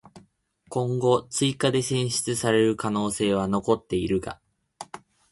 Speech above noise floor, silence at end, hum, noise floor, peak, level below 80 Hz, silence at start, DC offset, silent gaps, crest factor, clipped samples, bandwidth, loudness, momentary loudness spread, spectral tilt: 37 dB; 0.35 s; none; -61 dBFS; -6 dBFS; -54 dBFS; 0.15 s; under 0.1%; none; 18 dB; under 0.1%; 12 kHz; -25 LUFS; 19 LU; -5 dB/octave